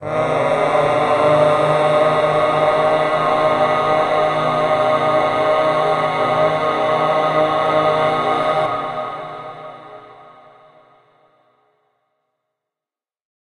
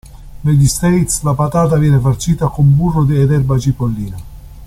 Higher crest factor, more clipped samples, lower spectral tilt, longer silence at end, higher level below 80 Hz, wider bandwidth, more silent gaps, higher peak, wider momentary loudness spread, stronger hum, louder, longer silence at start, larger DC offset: about the same, 14 dB vs 12 dB; neither; about the same, -5.5 dB/octave vs -6.5 dB/octave; first, 3.25 s vs 0 s; second, -54 dBFS vs -30 dBFS; second, 11 kHz vs 14.5 kHz; neither; about the same, -2 dBFS vs -2 dBFS; about the same, 9 LU vs 8 LU; neither; second, -16 LUFS vs -13 LUFS; about the same, 0 s vs 0.05 s; neither